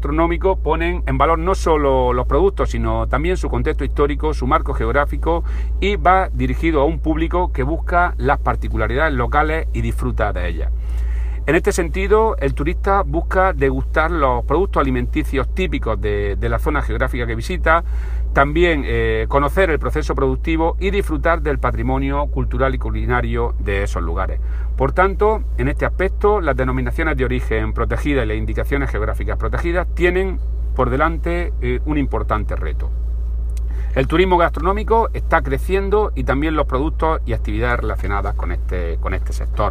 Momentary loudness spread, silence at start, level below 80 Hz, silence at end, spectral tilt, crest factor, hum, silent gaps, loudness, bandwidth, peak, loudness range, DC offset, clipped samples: 6 LU; 0 s; -22 dBFS; 0 s; -7 dB/octave; 16 dB; none; none; -19 LUFS; 10 kHz; 0 dBFS; 3 LU; under 0.1%; under 0.1%